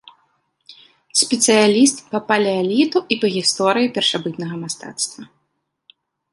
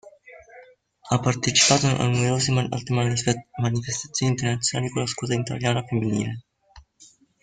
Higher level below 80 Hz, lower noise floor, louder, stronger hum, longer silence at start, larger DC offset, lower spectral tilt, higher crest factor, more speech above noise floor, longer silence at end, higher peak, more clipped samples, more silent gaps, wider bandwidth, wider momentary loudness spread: second, -66 dBFS vs -54 dBFS; first, -72 dBFS vs -55 dBFS; first, -17 LUFS vs -23 LUFS; neither; first, 0.7 s vs 0.05 s; neither; about the same, -3 dB/octave vs -4 dB/octave; about the same, 18 dB vs 20 dB; first, 55 dB vs 32 dB; first, 1.1 s vs 0.6 s; about the same, -2 dBFS vs -4 dBFS; neither; neither; first, 11.5 kHz vs 9.6 kHz; first, 13 LU vs 9 LU